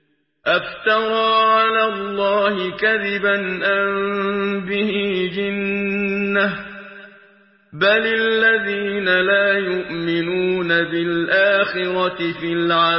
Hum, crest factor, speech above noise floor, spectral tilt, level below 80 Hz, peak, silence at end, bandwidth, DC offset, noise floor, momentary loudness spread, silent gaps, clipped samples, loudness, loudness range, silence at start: none; 14 dB; 34 dB; -9.5 dB/octave; -56 dBFS; -4 dBFS; 0 s; 5.8 kHz; under 0.1%; -52 dBFS; 7 LU; none; under 0.1%; -18 LUFS; 3 LU; 0.45 s